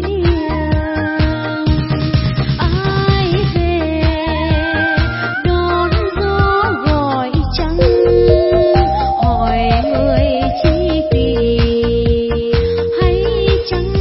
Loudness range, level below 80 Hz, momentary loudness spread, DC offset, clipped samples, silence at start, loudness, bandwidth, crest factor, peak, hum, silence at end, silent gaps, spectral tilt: 3 LU; -20 dBFS; 5 LU; 0.2%; under 0.1%; 0 s; -14 LUFS; 5.8 kHz; 14 dB; 0 dBFS; none; 0 s; none; -10.5 dB/octave